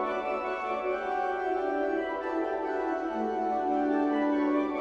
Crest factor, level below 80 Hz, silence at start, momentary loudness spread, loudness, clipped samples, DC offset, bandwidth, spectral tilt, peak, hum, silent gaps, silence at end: 14 dB; -62 dBFS; 0 s; 4 LU; -30 LUFS; under 0.1%; under 0.1%; 7.4 kHz; -6 dB/octave; -16 dBFS; none; none; 0 s